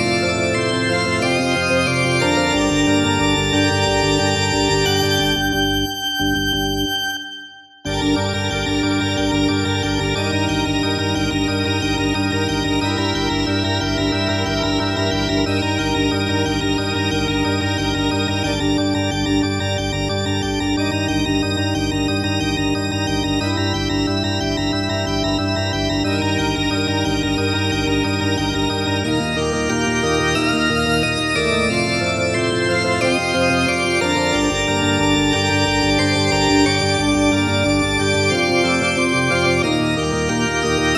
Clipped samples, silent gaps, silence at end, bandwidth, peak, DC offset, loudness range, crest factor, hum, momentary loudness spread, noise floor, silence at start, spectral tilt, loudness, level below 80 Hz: under 0.1%; none; 0 s; 15.5 kHz; -2 dBFS; under 0.1%; 3 LU; 16 dB; none; 4 LU; -38 dBFS; 0 s; -4.5 dB/octave; -18 LUFS; -36 dBFS